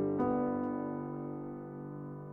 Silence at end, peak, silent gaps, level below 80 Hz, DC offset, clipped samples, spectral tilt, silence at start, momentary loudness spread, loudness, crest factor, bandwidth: 0 s; -20 dBFS; none; -64 dBFS; under 0.1%; under 0.1%; -11.5 dB/octave; 0 s; 12 LU; -37 LUFS; 16 dB; 3 kHz